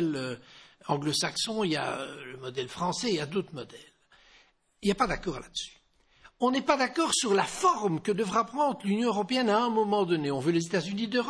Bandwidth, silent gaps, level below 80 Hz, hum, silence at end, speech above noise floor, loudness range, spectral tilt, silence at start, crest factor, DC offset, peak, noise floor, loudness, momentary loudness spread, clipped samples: 11 kHz; none; -58 dBFS; none; 0 s; 34 dB; 7 LU; -4 dB/octave; 0 s; 20 dB; under 0.1%; -10 dBFS; -63 dBFS; -28 LUFS; 12 LU; under 0.1%